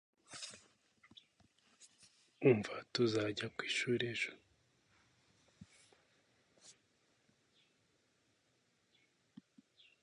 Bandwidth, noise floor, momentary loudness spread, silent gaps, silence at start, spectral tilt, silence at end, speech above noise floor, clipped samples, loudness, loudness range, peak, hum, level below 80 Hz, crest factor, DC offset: 11 kHz; -78 dBFS; 17 LU; none; 0.3 s; -5 dB/octave; 3.3 s; 42 dB; under 0.1%; -37 LUFS; 7 LU; -18 dBFS; none; -80 dBFS; 26 dB; under 0.1%